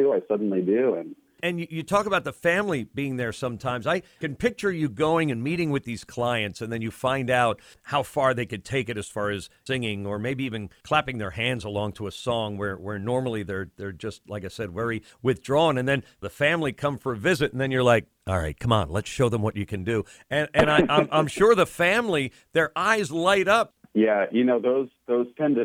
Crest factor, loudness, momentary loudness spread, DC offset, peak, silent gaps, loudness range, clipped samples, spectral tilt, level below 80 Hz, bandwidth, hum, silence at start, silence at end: 20 dB; -25 LUFS; 10 LU; under 0.1%; -4 dBFS; none; 6 LU; under 0.1%; -5.5 dB/octave; -52 dBFS; 16.5 kHz; none; 0 s; 0 s